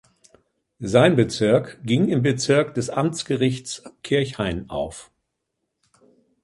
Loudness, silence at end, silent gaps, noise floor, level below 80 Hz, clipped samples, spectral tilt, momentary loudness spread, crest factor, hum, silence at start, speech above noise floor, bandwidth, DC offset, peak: -21 LUFS; 1.4 s; none; -78 dBFS; -50 dBFS; under 0.1%; -5.5 dB/octave; 14 LU; 20 dB; none; 0.8 s; 57 dB; 11.5 kHz; under 0.1%; -2 dBFS